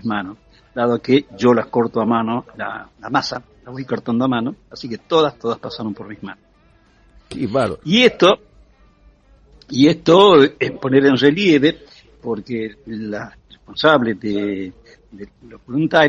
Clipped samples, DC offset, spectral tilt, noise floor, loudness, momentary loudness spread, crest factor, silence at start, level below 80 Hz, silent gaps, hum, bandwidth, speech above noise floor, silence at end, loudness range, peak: under 0.1%; under 0.1%; -6 dB/octave; -53 dBFS; -17 LUFS; 20 LU; 18 dB; 0.05 s; -52 dBFS; none; none; 9.8 kHz; 36 dB; 0 s; 8 LU; 0 dBFS